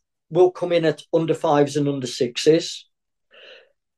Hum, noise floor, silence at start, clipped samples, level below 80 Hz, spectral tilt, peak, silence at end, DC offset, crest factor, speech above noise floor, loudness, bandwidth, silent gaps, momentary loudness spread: none; -58 dBFS; 0.3 s; under 0.1%; -72 dBFS; -5.5 dB/octave; -4 dBFS; 0.45 s; under 0.1%; 18 dB; 38 dB; -21 LUFS; 12.5 kHz; none; 7 LU